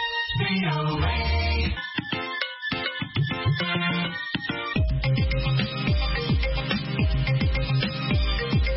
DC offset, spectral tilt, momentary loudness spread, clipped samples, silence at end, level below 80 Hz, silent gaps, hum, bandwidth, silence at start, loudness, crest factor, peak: under 0.1%; -10 dB/octave; 4 LU; under 0.1%; 0 s; -30 dBFS; none; none; 5.8 kHz; 0 s; -25 LUFS; 16 dB; -8 dBFS